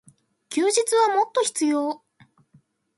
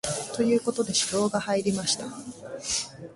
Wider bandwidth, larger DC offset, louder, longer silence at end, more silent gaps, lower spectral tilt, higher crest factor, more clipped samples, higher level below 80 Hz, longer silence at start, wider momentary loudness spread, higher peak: about the same, 12 kHz vs 11.5 kHz; neither; first, -22 LUFS vs -26 LUFS; first, 1 s vs 0 s; neither; second, -1.5 dB/octave vs -3 dB/octave; about the same, 16 dB vs 16 dB; neither; second, -80 dBFS vs -58 dBFS; first, 0.5 s vs 0.05 s; about the same, 10 LU vs 12 LU; first, -8 dBFS vs -12 dBFS